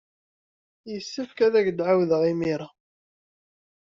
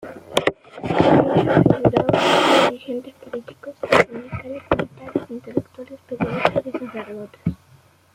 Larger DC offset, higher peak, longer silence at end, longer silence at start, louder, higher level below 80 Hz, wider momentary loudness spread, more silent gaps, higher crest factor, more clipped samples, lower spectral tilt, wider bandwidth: neither; second, -10 dBFS vs 0 dBFS; first, 1.2 s vs 0.6 s; first, 0.85 s vs 0 s; second, -24 LUFS vs -19 LUFS; second, -66 dBFS vs -48 dBFS; second, 15 LU vs 18 LU; neither; about the same, 18 dB vs 20 dB; neither; about the same, -5.5 dB/octave vs -6 dB/octave; second, 7.6 kHz vs 16 kHz